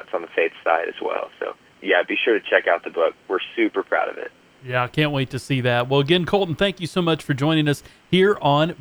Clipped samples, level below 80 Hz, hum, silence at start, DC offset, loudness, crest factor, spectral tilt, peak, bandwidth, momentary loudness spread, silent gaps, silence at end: under 0.1%; -54 dBFS; none; 0 s; under 0.1%; -21 LUFS; 20 dB; -6 dB/octave; 0 dBFS; over 20 kHz; 9 LU; none; 0.05 s